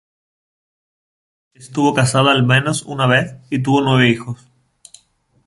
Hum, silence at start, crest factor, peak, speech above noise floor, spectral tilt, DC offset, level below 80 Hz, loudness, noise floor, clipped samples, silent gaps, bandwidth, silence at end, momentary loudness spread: none; 1.6 s; 16 dB; -2 dBFS; 42 dB; -5 dB/octave; under 0.1%; -54 dBFS; -15 LUFS; -58 dBFS; under 0.1%; none; 11.5 kHz; 1.1 s; 11 LU